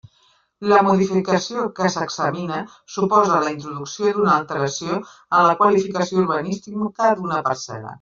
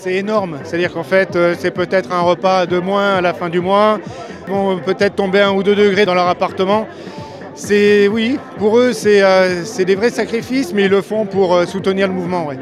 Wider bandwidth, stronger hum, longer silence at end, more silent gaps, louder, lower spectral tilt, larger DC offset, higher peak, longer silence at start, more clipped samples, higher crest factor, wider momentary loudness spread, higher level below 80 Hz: second, 7.6 kHz vs 13 kHz; neither; about the same, 0.05 s vs 0 s; neither; second, -20 LUFS vs -15 LUFS; about the same, -5.5 dB/octave vs -5.5 dB/octave; neither; about the same, -2 dBFS vs 0 dBFS; first, 0.6 s vs 0 s; neither; about the same, 18 dB vs 14 dB; first, 12 LU vs 8 LU; second, -62 dBFS vs -54 dBFS